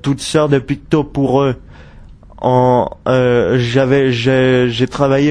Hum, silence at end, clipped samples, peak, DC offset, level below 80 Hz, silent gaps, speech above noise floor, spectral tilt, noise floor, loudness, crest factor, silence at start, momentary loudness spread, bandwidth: none; 0 s; under 0.1%; 0 dBFS; under 0.1%; -38 dBFS; none; 24 dB; -6.5 dB/octave; -37 dBFS; -14 LUFS; 14 dB; 0.05 s; 5 LU; 10.5 kHz